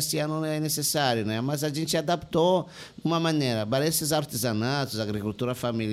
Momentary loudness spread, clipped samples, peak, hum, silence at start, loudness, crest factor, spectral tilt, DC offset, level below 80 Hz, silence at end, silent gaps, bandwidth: 6 LU; under 0.1%; -10 dBFS; none; 0 s; -26 LUFS; 16 dB; -4.5 dB/octave; under 0.1%; -58 dBFS; 0 s; none; 16 kHz